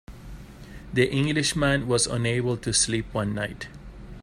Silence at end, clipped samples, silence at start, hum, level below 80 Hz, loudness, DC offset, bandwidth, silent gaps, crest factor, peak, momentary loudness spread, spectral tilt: 0 s; under 0.1%; 0.1 s; none; -44 dBFS; -24 LUFS; under 0.1%; 15.5 kHz; none; 18 dB; -8 dBFS; 22 LU; -4 dB/octave